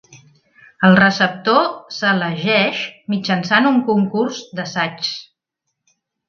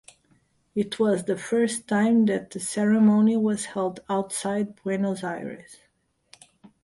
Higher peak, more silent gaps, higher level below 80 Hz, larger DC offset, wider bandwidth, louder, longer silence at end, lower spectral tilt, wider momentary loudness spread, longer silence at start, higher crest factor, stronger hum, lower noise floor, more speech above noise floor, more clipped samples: first, 0 dBFS vs -10 dBFS; neither; about the same, -62 dBFS vs -66 dBFS; neither; second, 7 kHz vs 11.5 kHz; first, -17 LUFS vs -24 LUFS; about the same, 1.05 s vs 1.1 s; about the same, -5.5 dB/octave vs -5.5 dB/octave; about the same, 12 LU vs 11 LU; second, 0.1 s vs 0.75 s; about the same, 18 dB vs 16 dB; neither; first, -77 dBFS vs -69 dBFS; first, 60 dB vs 45 dB; neither